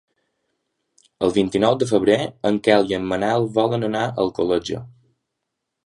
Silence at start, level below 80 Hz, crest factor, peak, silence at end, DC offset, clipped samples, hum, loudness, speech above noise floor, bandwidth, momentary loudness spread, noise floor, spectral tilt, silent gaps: 1.2 s; -54 dBFS; 20 dB; 0 dBFS; 1 s; under 0.1%; under 0.1%; none; -20 LUFS; 60 dB; 11.5 kHz; 6 LU; -79 dBFS; -6 dB/octave; none